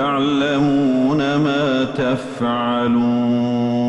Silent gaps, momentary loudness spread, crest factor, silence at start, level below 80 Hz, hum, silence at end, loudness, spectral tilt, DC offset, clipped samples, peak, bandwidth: none; 4 LU; 10 dB; 0 s; -50 dBFS; none; 0 s; -18 LUFS; -7 dB/octave; under 0.1%; under 0.1%; -8 dBFS; 8.6 kHz